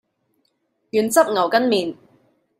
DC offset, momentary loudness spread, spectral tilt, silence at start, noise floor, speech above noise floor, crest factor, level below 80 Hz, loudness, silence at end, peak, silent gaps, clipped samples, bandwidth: under 0.1%; 7 LU; -3.5 dB/octave; 0.95 s; -69 dBFS; 51 dB; 20 dB; -70 dBFS; -19 LUFS; 0.65 s; -2 dBFS; none; under 0.1%; 16 kHz